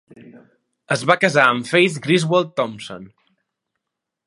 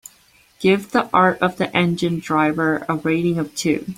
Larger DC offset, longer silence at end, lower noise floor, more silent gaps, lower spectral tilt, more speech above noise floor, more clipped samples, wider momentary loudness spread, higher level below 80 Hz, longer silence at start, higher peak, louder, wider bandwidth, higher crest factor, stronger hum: neither; first, 1.2 s vs 0.05 s; first, -81 dBFS vs -54 dBFS; neither; about the same, -5 dB/octave vs -5.5 dB/octave; first, 63 dB vs 36 dB; neither; first, 17 LU vs 5 LU; second, -68 dBFS vs -56 dBFS; second, 0.35 s vs 0.6 s; about the same, 0 dBFS vs -2 dBFS; about the same, -17 LUFS vs -19 LUFS; second, 11.5 kHz vs 16 kHz; about the same, 20 dB vs 18 dB; neither